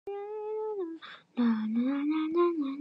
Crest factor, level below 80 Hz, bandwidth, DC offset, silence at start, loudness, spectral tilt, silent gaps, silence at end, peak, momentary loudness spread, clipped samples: 14 dB; -86 dBFS; 5.6 kHz; under 0.1%; 0.05 s; -31 LUFS; -8.5 dB/octave; none; 0 s; -16 dBFS; 11 LU; under 0.1%